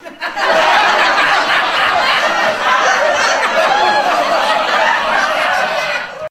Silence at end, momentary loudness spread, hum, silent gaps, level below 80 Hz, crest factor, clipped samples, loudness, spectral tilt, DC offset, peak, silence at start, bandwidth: 0 s; 4 LU; none; none; -50 dBFS; 14 dB; under 0.1%; -12 LUFS; -1 dB/octave; under 0.1%; 0 dBFS; 0 s; 16 kHz